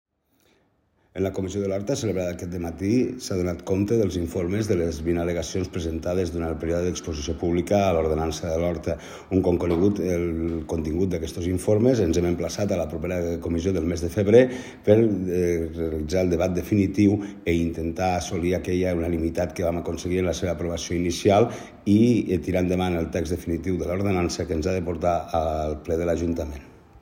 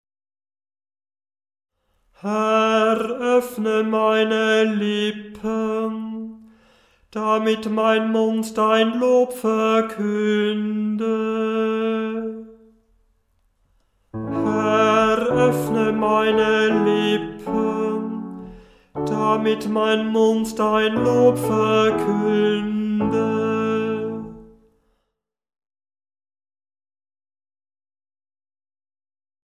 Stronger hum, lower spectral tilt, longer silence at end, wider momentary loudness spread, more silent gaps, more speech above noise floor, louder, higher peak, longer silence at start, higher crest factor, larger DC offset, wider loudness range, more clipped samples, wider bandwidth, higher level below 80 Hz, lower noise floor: neither; about the same, -6.5 dB/octave vs -5.5 dB/octave; second, 0.05 s vs 5.05 s; second, 8 LU vs 11 LU; neither; second, 42 dB vs 59 dB; second, -24 LUFS vs -20 LUFS; about the same, -2 dBFS vs -4 dBFS; second, 1.15 s vs 2.25 s; about the same, 20 dB vs 18 dB; neither; second, 4 LU vs 7 LU; neither; about the same, 16 kHz vs 15.5 kHz; first, -44 dBFS vs -56 dBFS; second, -66 dBFS vs -78 dBFS